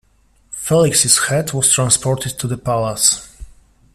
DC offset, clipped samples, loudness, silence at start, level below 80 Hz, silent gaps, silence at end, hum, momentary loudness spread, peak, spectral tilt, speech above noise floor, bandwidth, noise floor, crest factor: under 0.1%; under 0.1%; -15 LUFS; 0.5 s; -44 dBFS; none; 0.45 s; none; 11 LU; 0 dBFS; -3 dB/octave; 39 dB; 15.5 kHz; -55 dBFS; 18 dB